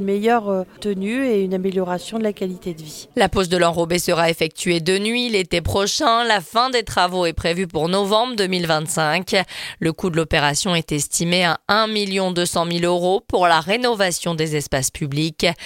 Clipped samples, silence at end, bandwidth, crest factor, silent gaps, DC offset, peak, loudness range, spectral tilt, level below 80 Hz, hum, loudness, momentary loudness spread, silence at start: under 0.1%; 0 s; 17 kHz; 18 dB; none; under 0.1%; 0 dBFS; 2 LU; -4 dB/octave; -42 dBFS; none; -19 LUFS; 7 LU; 0 s